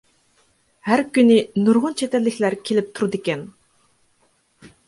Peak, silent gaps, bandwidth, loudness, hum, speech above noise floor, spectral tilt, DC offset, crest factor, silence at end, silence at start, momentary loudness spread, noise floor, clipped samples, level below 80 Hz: -4 dBFS; none; 11.5 kHz; -19 LUFS; none; 44 dB; -5.5 dB/octave; under 0.1%; 18 dB; 0.2 s; 0.85 s; 12 LU; -63 dBFS; under 0.1%; -66 dBFS